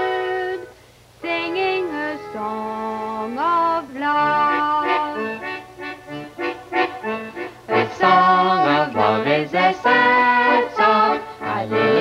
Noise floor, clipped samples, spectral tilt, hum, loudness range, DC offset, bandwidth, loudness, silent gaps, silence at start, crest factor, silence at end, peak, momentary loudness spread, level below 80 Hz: -48 dBFS; under 0.1%; -5.5 dB/octave; none; 8 LU; under 0.1%; 15 kHz; -19 LUFS; none; 0 s; 18 dB; 0 s; -2 dBFS; 14 LU; -60 dBFS